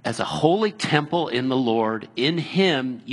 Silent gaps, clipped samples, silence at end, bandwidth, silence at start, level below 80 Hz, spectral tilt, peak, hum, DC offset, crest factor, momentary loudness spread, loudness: none; under 0.1%; 0 s; 11.5 kHz; 0.05 s; -64 dBFS; -5.5 dB/octave; -2 dBFS; none; under 0.1%; 20 dB; 4 LU; -22 LUFS